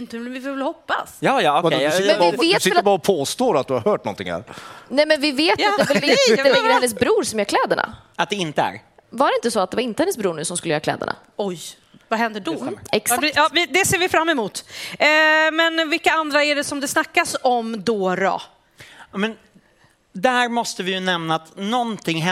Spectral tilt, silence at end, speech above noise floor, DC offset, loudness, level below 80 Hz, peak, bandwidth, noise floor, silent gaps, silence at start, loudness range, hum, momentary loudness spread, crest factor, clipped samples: -3 dB/octave; 0 s; 38 dB; under 0.1%; -19 LUFS; -60 dBFS; -2 dBFS; 16 kHz; -57 dBFS; none; 0 s; 6 LU; none; 12 LU; 18 dB; under 0.1%